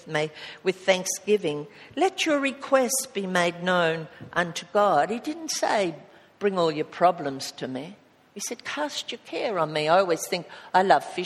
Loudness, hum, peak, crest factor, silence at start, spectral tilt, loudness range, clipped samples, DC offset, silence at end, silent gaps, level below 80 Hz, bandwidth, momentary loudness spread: -25 LUFS; none; -4 dBFS; 22 dB; 0.05 s; -3.5 dB/octave; 4 LU; under 0.1%; under 0.1%; 0 s; none; -72 dBFS; 15.5 kHz; 11 LU